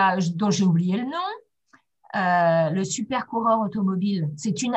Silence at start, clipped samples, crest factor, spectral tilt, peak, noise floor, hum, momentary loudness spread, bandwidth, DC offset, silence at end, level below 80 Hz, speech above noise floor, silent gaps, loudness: 0 s; under 0.1%; 14 dB; -5.5 dB/octave; -8 dBFS; -61 dBFS; none; 8 LU; 8.6 kHz; under 0.1%; 0 s; -66 dBFS; 39 dB; none; -23 LUFS